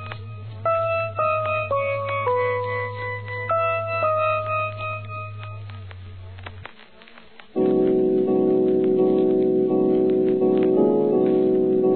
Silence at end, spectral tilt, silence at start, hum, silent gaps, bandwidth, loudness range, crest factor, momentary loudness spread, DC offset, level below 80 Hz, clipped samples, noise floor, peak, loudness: 0 s; -11.5 dB/octave; 0 s; none; none; 4.4 kHz; 8 LU; 14 dB; 18 LU; 0.3%; -58 dBFS; under 0.1%; -48 dBFS; -8 dBFS; -21 LUFS